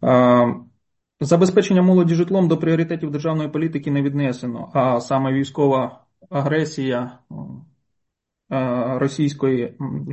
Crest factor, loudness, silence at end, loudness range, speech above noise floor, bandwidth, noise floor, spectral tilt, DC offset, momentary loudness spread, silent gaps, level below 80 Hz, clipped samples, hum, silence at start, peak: 16 dB; -20 LUFS; 0 s; 7 LU; 59 dB; 8.4 kHz; -78 dBFS; -7.5 dB/octave; under 0.1%; 13 LU; none; -60 dBFS; under 0.1%; none; 0 s; -4 dBFS